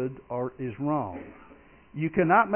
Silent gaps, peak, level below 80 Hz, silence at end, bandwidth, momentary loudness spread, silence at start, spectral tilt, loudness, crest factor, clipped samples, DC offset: none; -8 dBFS; -58 dBFS; 0 s; 3.3 kHz; 21 LU; 0 s; -7 dB/octave; -28 LUFS; 20 dB; under 0.1%; under 0.1%